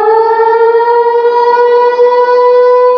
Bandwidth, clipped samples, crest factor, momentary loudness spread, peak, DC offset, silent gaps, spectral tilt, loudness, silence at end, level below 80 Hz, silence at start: 6 kHz; under 0.1%; 6 dB; 2 LU; 0 dBFS; under 0.1%; none; -3.5 dB/octave; -7 LUFS; 0 s; -84 dBFS; 0 s